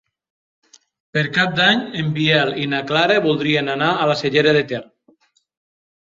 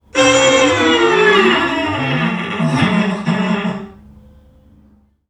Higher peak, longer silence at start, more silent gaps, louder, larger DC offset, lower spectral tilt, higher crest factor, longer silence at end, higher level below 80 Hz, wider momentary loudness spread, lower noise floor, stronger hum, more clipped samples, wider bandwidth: about the same, -2 dBFS vs 0 dBFS; first, 1.15 s vs 0.15 s; neither; second, -17 LUFS vs -14 LUFS; neither; first, -5.5 dB/octave vs -4 dB/octave; about the same, 18 dB vs 14 dB; about the same, 1.3 s vs 1.35 s; second, -60 dBFS vs -46 dBFS; about the same, 7 LU vs 8 LU; first, -58 dBFS vs -51 dBFS; neither; neither; second, 7.6 kHz vs 12 kHz